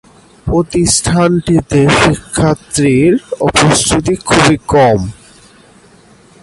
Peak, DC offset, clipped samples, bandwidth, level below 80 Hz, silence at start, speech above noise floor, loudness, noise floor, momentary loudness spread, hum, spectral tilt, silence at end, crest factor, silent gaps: 0 dBFS; under 0.1%; under 0.1%; 11.5 kHz; -32 dBFS; 0.45 s; 32 dB; -11 LUFS; -43 dBFS; 5 LU; none; -4.5 dB/octave; 1.3 s; 12 dB; none